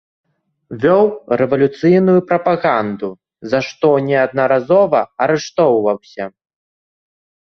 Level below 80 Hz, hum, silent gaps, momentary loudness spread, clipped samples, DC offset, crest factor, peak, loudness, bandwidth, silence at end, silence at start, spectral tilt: -58 dBFS; none; none; 14 LU; under 0.1%; under 0.1%; 14 dB; -2 dBFS; -15 LUFS; 6.8 kHz; 1.3 s; 0.7 s; -7 dB/octave